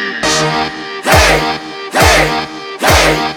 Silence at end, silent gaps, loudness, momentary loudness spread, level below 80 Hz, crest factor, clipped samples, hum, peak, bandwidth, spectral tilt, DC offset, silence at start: 0 s; none; -11 LUFS; 11 LU; -24 dBFS; 12 dB; 0.3%; none; 0 dBFS; over 20 kHz; -3 dB/octave; under 0.1%; 0 s